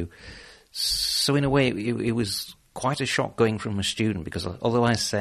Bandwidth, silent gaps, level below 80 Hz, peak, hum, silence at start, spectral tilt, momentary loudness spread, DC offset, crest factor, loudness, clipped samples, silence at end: 13.5 kHz; none; -50 dBFS; -8 dBFS; none; 0 s; -4.5 dB/octave; 12 LU; under 0.1%; 18 dB; -25 LUFS; under 0.1%; 0 s